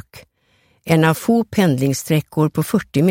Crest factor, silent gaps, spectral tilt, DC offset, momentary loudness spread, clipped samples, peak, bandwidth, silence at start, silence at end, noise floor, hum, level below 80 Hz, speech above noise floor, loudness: 16 dB; none; -6 dB/octave; under 0.1%; 4 LU; under 0.1%; -2 dBFS; 17 kHz; 0.15 s; 0 s; -60 dBFS; none; -52 dBFS; 44 dB; -17 LUFS